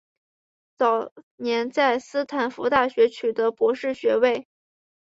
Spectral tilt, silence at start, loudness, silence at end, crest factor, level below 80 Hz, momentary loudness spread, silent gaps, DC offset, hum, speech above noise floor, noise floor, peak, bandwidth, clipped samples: -4 dB/octave; 0.8 s; -23 LUFS; 0.65 s; 20 dB; -66 dBFS; 6 LU; 1.12-1.16 s, 1.23-1.38 s; under 0.1%; none; over 68 dB; under -90 dBFS; -4 dBFS; 7.8 kHz; under 0.1%